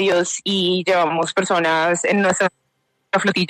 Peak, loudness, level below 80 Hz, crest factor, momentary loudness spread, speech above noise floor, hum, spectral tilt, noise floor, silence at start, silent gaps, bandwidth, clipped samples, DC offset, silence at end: -4 dBFS; -18 LUFS; -64 dBFS; 14 dB; 3 LU; 51 dB; none; -3.5 dB/octave; -69 dBFS; 0 s; none; 13 kHz; under 0.1%; under 0.1%; 0 s